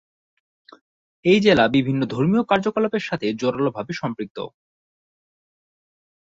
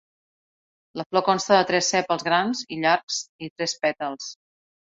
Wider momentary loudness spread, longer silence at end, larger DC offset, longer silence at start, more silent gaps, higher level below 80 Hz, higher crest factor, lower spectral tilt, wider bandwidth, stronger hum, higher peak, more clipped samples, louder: about the same, 14 LU vs 16 LU; first, 1.85 s vs 0.55 s; neither; first, 1.25 s vs 0.95 s; second, 4.30-4.35 s vs 1.06-1.10 s, 3.03-3.08 s, 3.29-3.39 s, 3.50-3.56 s; first, -56 dBFS vs -68 dBFS; about the same, 20 dB vs 20 dB; first, -6.5 dB/octave vs -3 dB/octave; about the same, 7.8 kHz vs 8 kHz; neither; about the same, -4 dBFS vs -4 dBFS; neither; first, -20 LUFS vs -23 LUFS